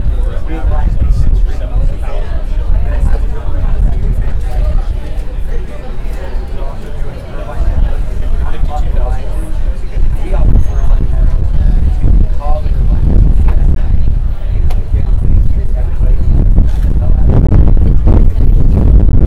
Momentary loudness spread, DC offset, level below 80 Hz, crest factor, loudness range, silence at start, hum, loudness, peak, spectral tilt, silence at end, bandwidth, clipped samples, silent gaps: 12 LU; under 0.1%; -10 dBFS; 8 dB; 8 LU; 0 s; none; -15 LUFS; 0 dBFS; -9 dB/octave; 0 s; 4.3 kHz; 2%; none